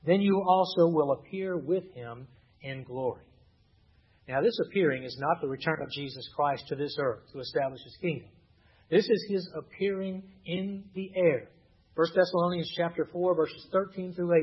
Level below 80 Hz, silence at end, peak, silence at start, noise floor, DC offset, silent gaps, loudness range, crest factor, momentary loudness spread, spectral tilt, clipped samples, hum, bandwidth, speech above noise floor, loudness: -68 dBFS; 0 s; -10 dBFS; 0.05 s; -64 dBFS; under 0.1%; none; 5 LU; 20 dB; 14 LU; -8 dB/octave; under 0.1%; none; 6 kHz; 35 dB; -30 LUFS